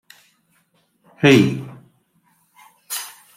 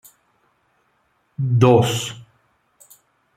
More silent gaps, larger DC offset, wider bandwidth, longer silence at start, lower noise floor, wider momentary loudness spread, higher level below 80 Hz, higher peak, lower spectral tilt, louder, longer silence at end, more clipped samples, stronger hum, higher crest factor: neither; neither; about the same, 16.5 kHz vs 15 kHz; second, 1.2 s vs 1.4 s; about the same, -63 dBFS vs -65 dBFS; second, 18 LU vs 24 LU; about the same, -62 dBFS vs -58 dBFS; about the same, -2 dBFS vs -2 dBFS; about the same, -5.5 dB/octave vs -6 dB/octave; about the same, -18 LUFS vs -18 LUFS; second, 0.3 s vs 1.15 s; neither; neither; about the same, 20 dB vs 20 dB